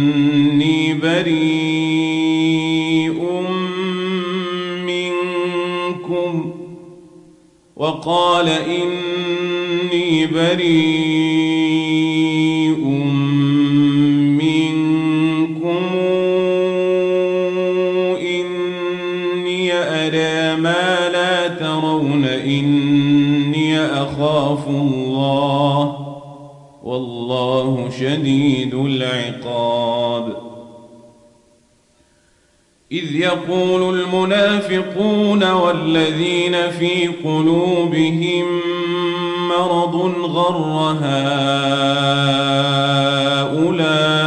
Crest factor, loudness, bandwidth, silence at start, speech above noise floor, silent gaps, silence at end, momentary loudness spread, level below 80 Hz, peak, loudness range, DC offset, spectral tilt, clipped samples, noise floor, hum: 12 dB; -17 LUFS; 10.5 kHz; 0 s; 41 dB; none; 0 s; 7 LU; -60 dBFS; -4 dBFS; 6 LU; under 0.1%; -6 dB/octave; under 0.1%; -57 dBFS; none